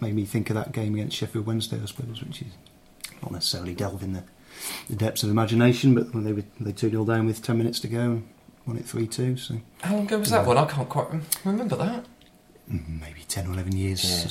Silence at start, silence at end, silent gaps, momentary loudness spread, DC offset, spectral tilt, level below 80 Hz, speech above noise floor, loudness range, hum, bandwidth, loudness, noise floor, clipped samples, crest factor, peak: 0 s; 0 s; none; 15 LU; under 0.1%; -5.5 dB/octave; -52 dBFS; 28 dB; 7 LU; none; 16.5 kHz; -26 LUFS; -54 dBFS; under 0.1%; 22 dB; -4 dBFS